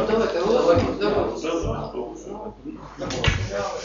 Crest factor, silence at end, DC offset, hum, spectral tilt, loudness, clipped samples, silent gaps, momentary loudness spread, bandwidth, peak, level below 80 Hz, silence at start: 18 dB; 0 s; under 0.1%; none; -4.5 dB/octave; -23 LUFS; under 0.1%; none; 16 LU; 7.6 kHz; -4 dBFS; -38 dBFS; 0 s